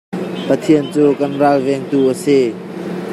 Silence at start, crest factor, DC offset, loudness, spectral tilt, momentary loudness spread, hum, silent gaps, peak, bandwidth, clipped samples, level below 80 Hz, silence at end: 0.1 s; 14 dB; under 0.1%; -15 LUFS; -6.5 dB/octave; 11 LU; none; none; -2 dBFS; 13 kHz; under 0.1%; -62 dBFS; 0 s